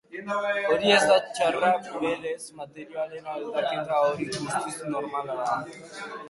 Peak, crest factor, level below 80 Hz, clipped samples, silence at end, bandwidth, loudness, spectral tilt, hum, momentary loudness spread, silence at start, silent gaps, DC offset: -8 dBFS; 20 dB; -66 dBFS; under 0.1%; 0 s; 11.5 kHz; -26 LUFS; -3.5 dB/octave; none; 16 LU; 0.1 s; none; under 0.1%